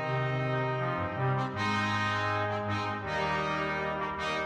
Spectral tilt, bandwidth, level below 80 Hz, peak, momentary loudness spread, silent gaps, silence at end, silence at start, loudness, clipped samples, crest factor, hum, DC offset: -6 dB/octave; 10 kHz; -56 dBFS; -18 dBFS; 3 LU; none; 0 s; 0 s; -31 LUFS; under 0.1%; 14 dB; none; under 0.1%